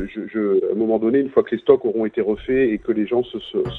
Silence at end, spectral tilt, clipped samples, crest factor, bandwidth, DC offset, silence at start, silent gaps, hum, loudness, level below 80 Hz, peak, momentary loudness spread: 0 s; -9 dB/octave; under 0.1%; 20 dB; 4.1 kHz; under 0.1%; 0 s; none; none; -20 LUFS; -48 dBFS; 0 dBFS; 6 LU